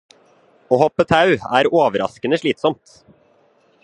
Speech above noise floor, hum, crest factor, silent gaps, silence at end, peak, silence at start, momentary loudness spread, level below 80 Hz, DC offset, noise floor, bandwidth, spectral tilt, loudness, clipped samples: 40 dB; none; 18 dB; none; 1.1 s; 0 dBFS; 0.7 s; 7 LU; -52 dBFS; under 0.1%; -57 dBFS; 10.5 kHz; -6 dB/octave; -17 LUFS; under 0.1%